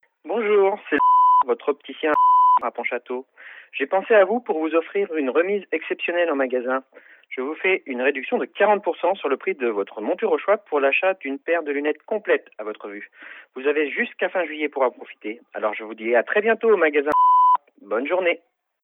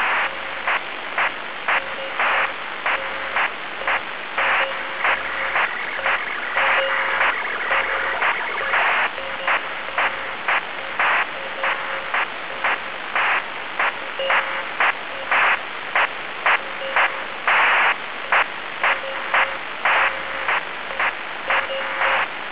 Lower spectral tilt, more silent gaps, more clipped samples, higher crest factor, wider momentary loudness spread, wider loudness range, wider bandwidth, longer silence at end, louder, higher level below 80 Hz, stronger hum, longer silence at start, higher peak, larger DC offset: first, -6.5 dB/octave vs 2 dB/octave; neither; neither; about the same, 18 dB vs 16 dB; first, 14 LU vs 7 LU; first, 6 LU vs 3 LU; about the same, 3.9 kHz vs 4 kHz; first, 0.45 s vs 0 s; about the same, -21 LUFS vs -21 LUFS; second, -74 dBFS vs -60 dBFS; neither; first, 0.25 s vs 0 s; about the same, -4 dBFS vs -6 dBFS; second, under 0.1% vs 1%